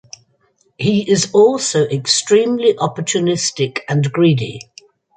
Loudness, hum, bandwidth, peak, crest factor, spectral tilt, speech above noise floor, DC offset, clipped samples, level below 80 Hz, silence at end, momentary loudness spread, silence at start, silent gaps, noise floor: -15 LUFS; none; 9.6 kHz; 0 dBFS; 16 dB; -4.5 dB/octave; 45 dB; under 0.1%; under 0.1%; -58 dBFS; 0.6 s; 8 LU; 0.8 s; none; -60 dBFS